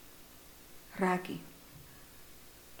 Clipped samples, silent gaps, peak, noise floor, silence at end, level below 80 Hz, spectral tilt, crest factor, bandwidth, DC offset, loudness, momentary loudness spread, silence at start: under 0.1%; none; -18 dBFS; -55 dBFS; 0 s; -64 dBFS; -5.5 dB/octave; 24 dB; 19 kHz; under 0.1%; -36 LUFS; 21 LU; 0 s